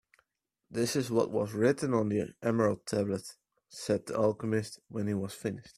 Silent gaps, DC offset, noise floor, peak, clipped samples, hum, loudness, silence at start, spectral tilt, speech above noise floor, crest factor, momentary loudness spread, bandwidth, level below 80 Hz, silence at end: none; under 0.1%; -83 dBFS; -12 dBFS; under 0.1%; none; -32 LUFS; 0.7 s; -6 dB/octave; 52 dB; 20 dB; 10 LU; 14.5 kHz; -68 dBFS; 0.05 s